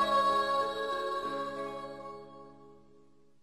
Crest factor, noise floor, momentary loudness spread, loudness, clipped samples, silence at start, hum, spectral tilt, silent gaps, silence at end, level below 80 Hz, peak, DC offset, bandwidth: 16 dB; -64 dBFS; 23 LU; -32 LUFS; under 0.1%; 0 s; none; -3.5 dB/octave; none; 0.7 s; -68 dBFS; -18 dBFS; 0.1%; 12 kHz